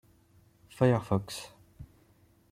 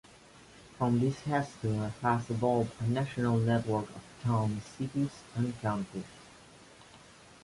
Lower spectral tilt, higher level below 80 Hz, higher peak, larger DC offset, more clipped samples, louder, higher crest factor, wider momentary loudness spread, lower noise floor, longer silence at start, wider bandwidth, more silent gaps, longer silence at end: about the same, -7 dB/octave vs -7.5 dB/octave; about the same, -60 dBFS vs -60 dBFS; about the same, -12 dBFS vs -14 dBFS; neither; neither; about the same, -30 LUFS vs -32 LUFS; about the same, 22 dB vs 18 dB; first, 27 LU vs 9 LU; first, -64 dBFS vs -56 dBFS; first, 0.8 s vs 0.35 s; first, 15 kHz vs 11.5 kHz; neither; first, 0.65 s vs 0.45 s